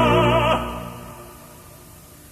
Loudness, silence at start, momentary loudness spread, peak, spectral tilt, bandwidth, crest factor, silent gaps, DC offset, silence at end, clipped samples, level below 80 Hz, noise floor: -20 LUFS; 0 s; 26 LU; -6 dBFS; -6 dB/octave; 15 kHz; 16 dB; none; under 0.1%; 0.75 s; under 0.1%; -38 dBFS; -44 dBFS